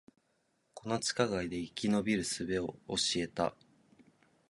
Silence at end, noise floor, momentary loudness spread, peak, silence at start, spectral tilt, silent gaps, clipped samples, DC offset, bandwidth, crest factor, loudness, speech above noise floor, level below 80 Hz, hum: 0.95 s; -76 dBFS; 6 LU; -14 dBFS; 0.75 s; -3.5 dB/octave; none; under 0.1%; under 0.1%; 11.5 kHz; 22 dB; -34 LUFS; 42 dB; -62 dBFS; none